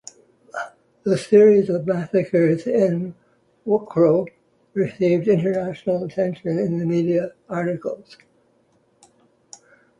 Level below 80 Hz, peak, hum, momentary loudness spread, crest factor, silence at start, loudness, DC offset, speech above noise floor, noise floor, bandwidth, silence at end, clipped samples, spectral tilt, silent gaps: -64 dBFS; -4 dBFS; none; 16 LU; 18 dB; 0.55 s; -20 LUFS; under 0.1%; 42 dB; -62 dBFS; 11 kHz; 2.05 s; under 0.1%; -8 dB/octave; none